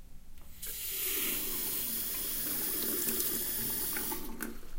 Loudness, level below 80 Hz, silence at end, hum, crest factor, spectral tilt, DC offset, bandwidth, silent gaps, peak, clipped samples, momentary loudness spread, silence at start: -32 LUFS; -50 dBFS; 0 s; none; 20 dB; -1 dB/octave; under 0.1%; 16.5 kHz; none; -16 dBFS; under 0.1%; 8 LU; 0 s